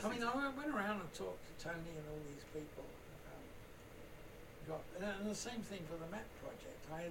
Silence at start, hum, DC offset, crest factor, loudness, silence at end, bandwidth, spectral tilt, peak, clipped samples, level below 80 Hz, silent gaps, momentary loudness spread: 0 s; none; under 0.1%; 20 dB; -46 LUFS; 0 s; 16.5 kHz; -4.5 dB/octave; -26 dBFS; under 0.1%; -62 dBFS; none; 16 LU